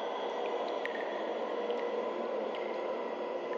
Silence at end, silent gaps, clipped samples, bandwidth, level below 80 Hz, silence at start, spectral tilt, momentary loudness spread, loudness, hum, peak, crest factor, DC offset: 0 s; none; under 0.1%; 7.2 kHz; under -90 dBFS; 0 s; -4.5 dB/octave; 2 LU; -36 LUFS; none; -22 dBFS; 14 dB; under 0.1%